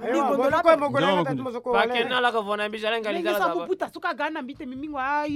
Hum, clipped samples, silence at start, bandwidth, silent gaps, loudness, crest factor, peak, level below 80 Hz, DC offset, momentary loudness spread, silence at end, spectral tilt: none; under 0.1%; 0 s; 16 kHz; none; -24 LUFS; 18 dB; -6 dBFS; -60 dBFS; under 0.1%; 10 LU; 0 s; -5 dB/octave